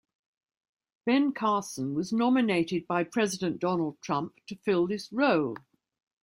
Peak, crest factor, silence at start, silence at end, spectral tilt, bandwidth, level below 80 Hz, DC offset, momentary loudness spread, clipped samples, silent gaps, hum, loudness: -12 dBFS; 16 dB; 1.05 s; 0.65 s; -5.5 dB/octave; 15.5 kHz; -70 dBFS; under 0.1%; 8 LU; under 0.1%; none; none; -28 LUFS